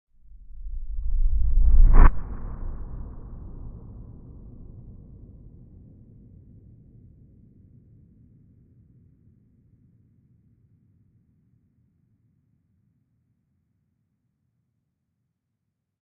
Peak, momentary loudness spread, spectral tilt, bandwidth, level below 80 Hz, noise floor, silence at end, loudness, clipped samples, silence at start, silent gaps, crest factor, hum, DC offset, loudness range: 0 dBFS; 30 LU; -6 dB/octave; 2.5 kHz; -26 dBFS; -80 dBFS; 12.05 s; -27 LUFS; under 0.1%; 0.6 s; none; 24 dB; none; under 0.1%; 26 LU